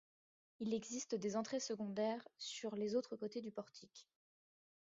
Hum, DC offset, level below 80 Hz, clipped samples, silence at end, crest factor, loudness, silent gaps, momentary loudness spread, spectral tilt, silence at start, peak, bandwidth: none; under 0.1%; -86 dBFS; under 0.1%; 0.85 s; 18 dB; -44 LUFS; none; 13 LU; -4.5 dB/octave; 0.6 s; -28 dBFS; 7.6 kHz